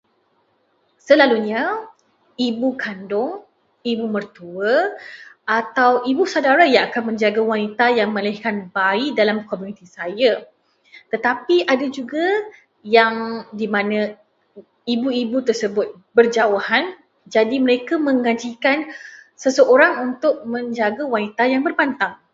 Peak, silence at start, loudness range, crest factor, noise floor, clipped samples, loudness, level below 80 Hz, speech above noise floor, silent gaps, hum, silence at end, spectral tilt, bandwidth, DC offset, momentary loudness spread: 0 dBFS; 1.05 s; 4 LU; 20 dB; -63 dBFS; under 0.1%; -19 LUFS; -70 dBFS; 45 dB; none; none; 0.2 s; -4.5 dB/octave; 7.8 kHz; under 0.1%; 13 LU